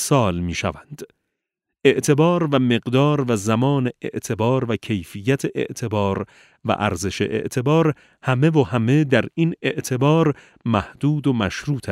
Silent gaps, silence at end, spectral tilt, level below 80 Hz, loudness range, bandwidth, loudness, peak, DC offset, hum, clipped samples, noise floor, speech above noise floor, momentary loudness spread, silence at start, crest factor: none; 0 s; -6 dB/octave; -50 dBFS; 4 LU; 15.5 kHz; -20 LUFS; -2 dBFS; under 0.1%; none; under 0.1%; -81 dBFS; 61 dB; 10 LU; 0 s; 18 dB